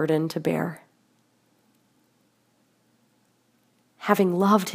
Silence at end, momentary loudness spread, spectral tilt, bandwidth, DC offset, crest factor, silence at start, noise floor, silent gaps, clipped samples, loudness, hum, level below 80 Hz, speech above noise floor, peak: 0 s; 14 LU; -6.5 dB/octave; 15.5 kHz; under 0.1%; 24 dB; 0 s; -66 dBFS; none; under 0.1%; -24 LUFS; none; -74 dBFS; 44 dB; -4 dBFS